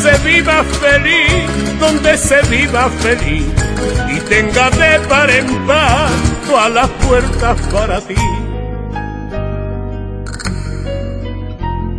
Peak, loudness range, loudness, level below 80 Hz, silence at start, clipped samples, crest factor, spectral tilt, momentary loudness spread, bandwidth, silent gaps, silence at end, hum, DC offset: 0 dBFS; 10 LU; -13 LUFS; -22 dBFS; 0 s; under 0.1%; 12 dB; -4.5 dB/octave; 13 LU; 11 kHz; none; 0 s; none; under 0.1%